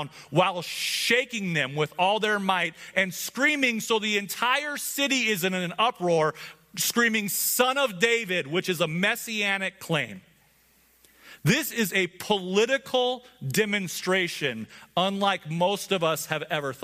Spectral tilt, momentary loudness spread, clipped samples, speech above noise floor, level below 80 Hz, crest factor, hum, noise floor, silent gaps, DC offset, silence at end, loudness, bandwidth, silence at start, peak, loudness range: -3 dB/octave; 6 LU; under 0.1%; 36 dB; -70 dBFS; 20 dB; none; -62 dBFS; none; under 0.1%; 0 s; -25 LUFS; 15.5 kHz; 0 s; -6 dBFS; 3 LU